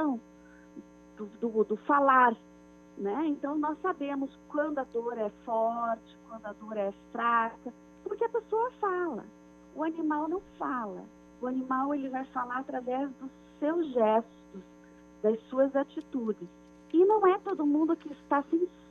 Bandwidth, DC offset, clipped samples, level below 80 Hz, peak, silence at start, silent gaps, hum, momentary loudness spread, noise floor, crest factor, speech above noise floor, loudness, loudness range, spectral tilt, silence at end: 6.8 kHz; under 0.1%; under 0.1%; -70 dBFS; -10 dBFS; 0 s; none; 60 Hz at -60 dBFS; 19 LU; -54 dBFS; 20 dB; 24 dB; -30 LUFS; 5 LU; -7 dB/octave; 0.2 s